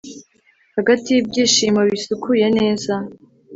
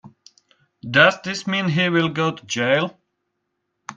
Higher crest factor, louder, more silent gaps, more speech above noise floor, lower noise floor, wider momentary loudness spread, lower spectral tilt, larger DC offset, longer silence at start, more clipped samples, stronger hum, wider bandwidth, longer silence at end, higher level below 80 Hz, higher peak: second, 16 dB vs 22 dB; about the same, -17 LUFS vs -19 LUFS; neither; second, 41 dB vs 56 dB; second, -58 dBFS vs -76 dBFS; about the same, 12 LU vs 13 LU; about the same, -3.5 dB/octave vs -4.5 dB/octave; neither; about the same, 0.05 s vs 0.05 s; neither; neither; second, 8 kHz vs 9.8 kHz; about the same, 0 s vs 0.05 s; first, -56 dBFS vs -62 dBFS; about the same, -2 dBFS vs 0 dBFS